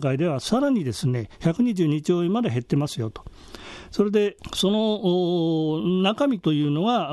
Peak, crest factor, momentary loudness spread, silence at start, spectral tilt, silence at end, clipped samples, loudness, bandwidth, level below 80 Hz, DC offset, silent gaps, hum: -8 dBFS; 14 dB; 10 LU; 0 s; -6.5 dB/octave; 0 s; under 0.1%; -23 LUFS; 12.5 kHz; -52 dBFS; under 0.1%; none; none